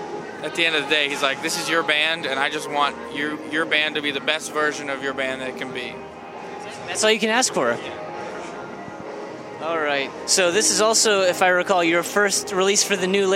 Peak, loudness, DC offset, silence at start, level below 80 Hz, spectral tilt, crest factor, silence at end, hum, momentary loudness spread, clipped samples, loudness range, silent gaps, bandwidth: -2 dBFS; -20 LUFS; under 0.1%; 0 s; -64 dBFS; -1.5 dB/octave; 20 dB; 0 s; none; 16 LU; under 0.1%; 6 LU; none; 16.5 kHz